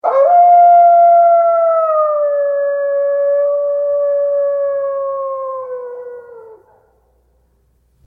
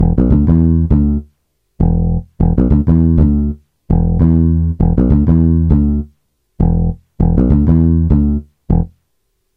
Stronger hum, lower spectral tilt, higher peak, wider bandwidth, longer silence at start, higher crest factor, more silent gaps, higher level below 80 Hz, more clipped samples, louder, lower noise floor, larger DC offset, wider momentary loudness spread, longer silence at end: neither; second, -5.5 dB/octave vs -13 dB/octave; about the same, -2 dBFS vs 0 dBFS; first, 2.7 kHz vs 2.3 kHz; about the same, 0.05 s vs 0 s; about the same, 12 dB vs 12 dB; neither; second, -66 dBFS vs -18 dBFS; neither; about the same, -12 LUFS vs -13 LUFS; second, -57 dBFS vs -66 dBFS; neither; first, 16 LU vs 7 LU; first, 1.5 s vs 0.7 s